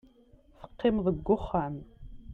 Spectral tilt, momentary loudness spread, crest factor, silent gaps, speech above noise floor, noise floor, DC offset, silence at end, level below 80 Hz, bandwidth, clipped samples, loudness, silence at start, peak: -9.5 dB/octave; 14 LU; 18 dB; none; 31 dB; -59 dBFS; under 0.1%; 0 s; -48 dBFS; 4.6 kHz; under 0.1%; -30 LUFS; 0.6 s; -14 dBFS